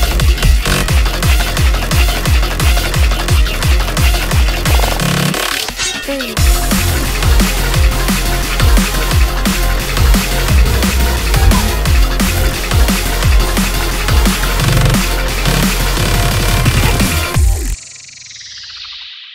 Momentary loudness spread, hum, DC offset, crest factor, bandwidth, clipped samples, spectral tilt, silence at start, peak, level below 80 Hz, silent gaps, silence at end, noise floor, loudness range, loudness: 4 LU; none; under 0.1%; 12 dB; 16.5 kHz; under 0.1%; -4 dB/octave; 0 s; 0 dBFS; -14 dBFS; none; 0 s; -33 dBFS; 1 LU; -13 LUFS